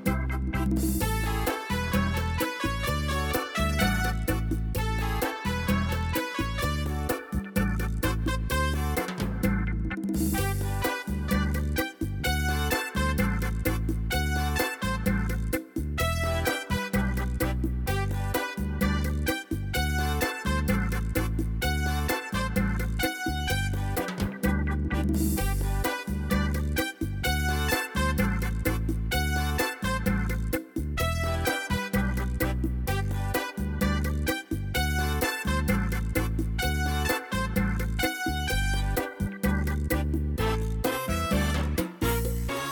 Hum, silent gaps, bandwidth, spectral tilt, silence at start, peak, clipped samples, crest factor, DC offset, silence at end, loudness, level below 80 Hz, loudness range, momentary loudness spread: none; none; 19.5 kHz; -5 dB/octave; 0 s; -10 dBFS; under 0.1%; 16 dB; under 0.1%; 0 s; -28 LUFS; -32 dBFS; 1 LU; 3 LU